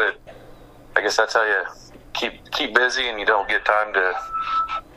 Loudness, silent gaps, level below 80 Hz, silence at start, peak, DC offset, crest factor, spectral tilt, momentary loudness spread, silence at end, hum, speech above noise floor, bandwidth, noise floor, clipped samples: -21 LUFS; none; -50 dBFS; 0 s; 0 dBFS; under 0.1%; 22 dB; -1.5 dB/octave; 8 LU; 0.05 s; none; 23 dB; 15 kHz; -44 dBFS; under 0.1%